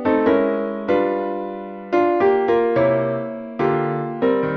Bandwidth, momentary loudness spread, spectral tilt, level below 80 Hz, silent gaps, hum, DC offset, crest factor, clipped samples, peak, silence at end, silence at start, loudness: 6.2 kHz; 10 LU; -9 dB/octave; -54 dBFS; none; none; under 0.1%; 14 dB; under 0.1%; -4 dBFS; 0 s; 0 s; -20 LUFS